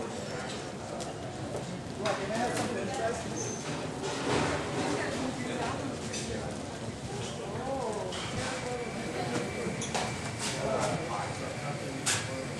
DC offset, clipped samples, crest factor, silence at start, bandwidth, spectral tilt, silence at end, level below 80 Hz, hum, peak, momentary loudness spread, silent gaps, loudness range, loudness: under 0.1%; under 0.1%; 18 dB; 0 s; 13 kHz; -4 dB/octave; 0 s; -54 dBFS; none; -16 dBFS; 7 LU; none; 3 LU; -34 LUFS